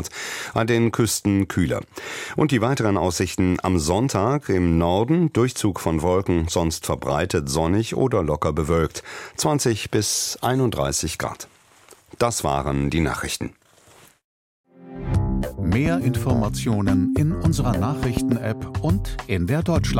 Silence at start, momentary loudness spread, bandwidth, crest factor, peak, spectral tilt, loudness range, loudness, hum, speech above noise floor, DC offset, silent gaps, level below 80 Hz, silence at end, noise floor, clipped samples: 0 s; 7 LU; 16.5 kHz; 16 dB; -6 dBFS; -5.5 dB/octave; 5 LU; -22 LUFS; none; 31 dB; under 0.1%; 14.24-14.64 s; -36 dBFS; 0 s; -52 dBFS; under 0.1%